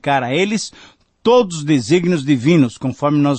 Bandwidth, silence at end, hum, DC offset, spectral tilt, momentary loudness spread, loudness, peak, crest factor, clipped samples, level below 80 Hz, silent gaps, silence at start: 8.8 kHz; 0 s; none; under 0.1%; -6 dB/octave; 7 LU; -16 LUFS; -2 dBFS; 14 dB; under 0.1%; -56 dBFS; none; 0.05 s